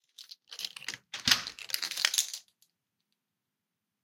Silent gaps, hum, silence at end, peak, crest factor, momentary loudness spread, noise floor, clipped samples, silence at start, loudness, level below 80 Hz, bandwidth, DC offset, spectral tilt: none; none; 1.65 s; -6 dBFS; 30 dB; 19 LU; -86 dBFS; under 0.1%; 0.2 s; -30 LUFS; -70 dBFS; 16.5 kHz; under 0.1%; 1 dB/octave